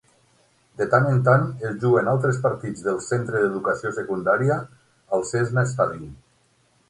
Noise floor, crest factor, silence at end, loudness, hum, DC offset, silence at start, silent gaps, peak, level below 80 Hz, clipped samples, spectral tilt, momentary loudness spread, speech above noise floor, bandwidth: -63 dBFS; 18 dB; 0.75 s; -22 LUFS; none; under 0.1%; 0.8 s; none; -4 dBFS; -58 dBFS; under 0.1%; -7 dB/octave; 9 LU; 41 dB; 11 kHz